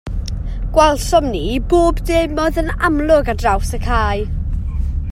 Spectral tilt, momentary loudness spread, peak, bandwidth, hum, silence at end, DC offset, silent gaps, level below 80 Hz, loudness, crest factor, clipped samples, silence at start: -6 dB/octave; 10 LU; 0 dBFS; 15 kHz; none; 0 s; under 0.1%; none; -22 dBFS; -17 LUFS; 16 dB; under 0.1%; 0.05 s